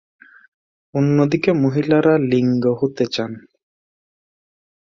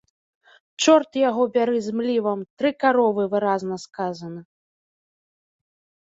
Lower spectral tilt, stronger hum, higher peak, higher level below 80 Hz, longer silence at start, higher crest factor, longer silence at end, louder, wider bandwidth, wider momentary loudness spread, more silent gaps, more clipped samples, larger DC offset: first, -7.5 dB/octave vs -4.5 dB/octave; neither; about the same, -2 dBFS vs -4 dBFS; first, -58 dBFS vs -72 dBFS; first, 0.95 s vs 0.8 s; about the same, 16 dB vs 20 dB; about the same, 1.5 s vs 1.6 s; first, -18 LUFS vs -22 LUFS; about the same, 7.4 kHz vs 8 kHz; about the same, 10 LU vs 12 LU; second, none vs 2.50-2.57 s; neither; neither